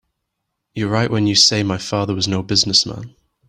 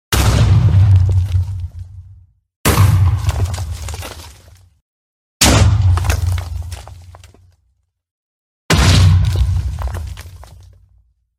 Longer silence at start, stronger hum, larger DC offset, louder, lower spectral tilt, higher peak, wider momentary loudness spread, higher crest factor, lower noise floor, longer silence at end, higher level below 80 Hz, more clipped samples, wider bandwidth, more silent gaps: first, 0.75 s vs 0.1 s; neither; neither; about the same, -16 LUFS vs -14 LUFS; about the same, -3.5 dB/octave vs -4.5 dB/octave; about the same, 0 dBFS vs 0 dBFS; second, 13 LU vs 20 LU; about the same, 20 dB vs 16 dB; first, -76 dBFS vs -64 dBFS; second, 0.4 s vs 0.95 s; second, -52 dBFS vs -24 dBFS; neither; second, 13 kHz vs 16 kHz; second, none vs 2.56-2.64 s, 4.81-5.40 s, 8.11-8.69 s